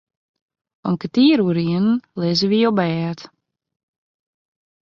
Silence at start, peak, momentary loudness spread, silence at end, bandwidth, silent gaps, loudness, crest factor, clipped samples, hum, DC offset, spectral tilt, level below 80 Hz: 0.85 s; -4 dBFS; 11 LU; 1.6 s; 7.2 kHz; none; -18 LUFS; 16 dB; under 0.1%; none; under 0.1%; -7 dB/octave; -62 dBFS